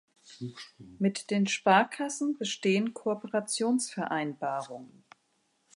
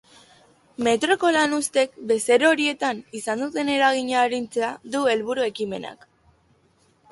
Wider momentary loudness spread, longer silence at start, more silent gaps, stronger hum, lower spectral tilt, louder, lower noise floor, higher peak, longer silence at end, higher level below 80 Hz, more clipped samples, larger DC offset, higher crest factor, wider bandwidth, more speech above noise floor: first, 19 LU vs 11 LU; second, 0.3 s vs 0.8 s; neither; neither; first, -4 dB/octave vs -2.5 dB/octave; second, -29 LUFS vs -22 LUFS; first, -73 dBFS vs -62 dBFS; second, -10 dBFS vs -6 dBFS; second, 0.9 s vs 1.15 s; second, -78 dBFS vs -66 dBFS; neither; neither; about the same, 22 dB vs 18 dB; about the same, 11.5 kHz vs 11.5 kHz; first, 44 dB vs 40 dB